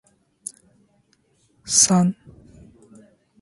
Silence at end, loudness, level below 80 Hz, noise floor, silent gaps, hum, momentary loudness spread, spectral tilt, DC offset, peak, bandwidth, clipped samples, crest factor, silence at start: 1.3 s; -17 LUFS; -60 dBFS; -63 dBFS; none; none; 25 LU; -3.5 dB/octave; under 0.1%; -2 dBFS; 11.5 kHz; under 0.1%; 24 dB; 1.65 s